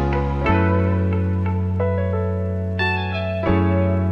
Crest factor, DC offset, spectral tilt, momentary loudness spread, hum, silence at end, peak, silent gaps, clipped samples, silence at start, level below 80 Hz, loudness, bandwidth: 14 dB; under 0.1%; -9 dB/octave; 5 LU; none; 0 s; -4 dBFS; none; under 0.1%; 0 s; -34 dBFS; -21 LUFS; 5.4 kHz